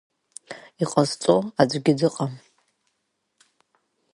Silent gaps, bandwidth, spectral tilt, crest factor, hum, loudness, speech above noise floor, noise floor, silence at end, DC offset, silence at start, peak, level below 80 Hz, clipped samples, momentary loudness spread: none; 11.5 kHz; -5.5 dB/octave; 24 dB; none; -22 LUFS; 54 dB; -75 dBFS; 1.75 s; under 0.1%; 0.5 s; -2 dBFS; -64 dBFS; under 0.1%; 23 LU